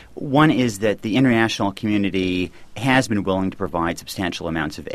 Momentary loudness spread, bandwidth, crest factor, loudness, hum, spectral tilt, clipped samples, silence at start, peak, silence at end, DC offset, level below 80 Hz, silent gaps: 9 LU; 14.5 kHz; 18 dB; -21 LUFS; none; -5.5 dB/octave; under 0.1%; 0 s; -2 dBFS; 0 s; under 0.1%; -46 dBFS; none